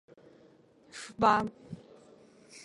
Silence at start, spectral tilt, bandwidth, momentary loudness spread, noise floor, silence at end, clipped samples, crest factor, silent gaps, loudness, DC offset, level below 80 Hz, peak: 0.95 s; -5 dB/octave; 11.5 kHz; 23 LU; -61 dBFS; 0.05 s; under 0.1%; 22 dB; none; -28 LUFS; under 0.1%; -66 dBFS; -12 dBFS